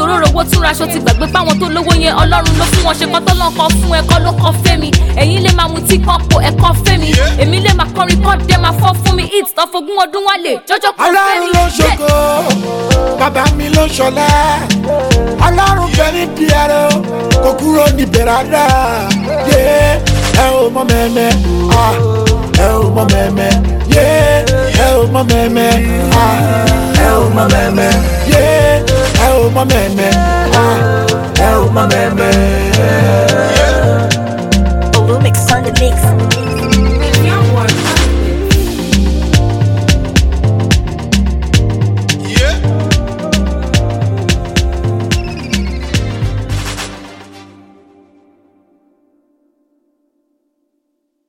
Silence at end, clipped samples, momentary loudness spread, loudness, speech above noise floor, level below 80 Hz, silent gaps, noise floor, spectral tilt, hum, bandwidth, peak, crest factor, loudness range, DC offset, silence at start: 3.85 s; under 0.1%; 5 LU; -11 LUFS; 57 dB; -18 dBFS; none; -66 dBFS; -5 dB/octave; none; 18 kHz; 0 dBFS; 10 dB; 4 LU; under 0.1%; 0 s